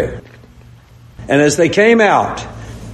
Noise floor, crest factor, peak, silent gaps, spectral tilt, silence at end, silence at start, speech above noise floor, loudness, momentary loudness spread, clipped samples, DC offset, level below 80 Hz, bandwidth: -41 dBFS; 14 dB; 0 dBFS; none; -4.5 dB/octave; 0 s; 0 s; 29 dB; -12 LUFS; 21 LU; under 0.1%; under 0.1%; -40 dBFS; 12.5 kHz